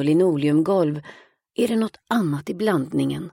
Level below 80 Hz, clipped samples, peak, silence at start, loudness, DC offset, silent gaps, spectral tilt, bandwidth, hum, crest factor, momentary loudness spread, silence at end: -62 dBFS; under 0.1%; -6 dBFS; 0 s; -22 LUFS; under 0.1%; none; -7 dB/octave; 16.5 kHz; none; 16 dB; 7 LU; 0.05 s